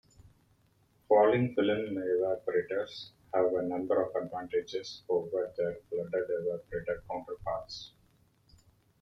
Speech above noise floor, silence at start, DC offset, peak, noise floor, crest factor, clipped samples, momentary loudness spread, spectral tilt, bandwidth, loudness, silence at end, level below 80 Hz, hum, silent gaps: 37 dB; 1.1 s; under 0.1%; -12 dBFS; -68 dBFS; 20 dB; under 0.1%; 12 LU; -6.5 dB/octave; 7.4 kHz; -32 LUFS; 1.15 s; -64 dBFS; none; none